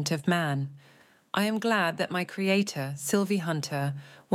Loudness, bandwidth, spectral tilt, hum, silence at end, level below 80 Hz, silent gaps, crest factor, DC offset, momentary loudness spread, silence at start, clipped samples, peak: -28 LUFS; 16.5 kHz; -5 dB/octave; none; 0 s; -76 dBFS; none; 18 dB; under 0.1%; 7 LU; 0 s; under 0.1%; -12 dBFS